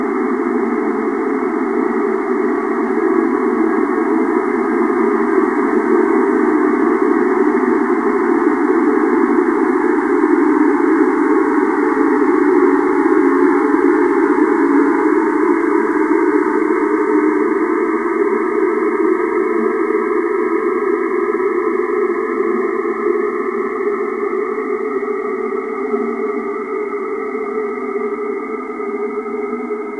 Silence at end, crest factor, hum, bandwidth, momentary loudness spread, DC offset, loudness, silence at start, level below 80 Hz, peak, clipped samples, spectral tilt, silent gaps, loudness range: 0 s; 14 dB; none; 11 kHz; 8 LU; 0.1%; -16 LUFS; 0 s; -62 dBFS; 0 dBFS; under 0.1%; -7 dB/octave; none; 7 LU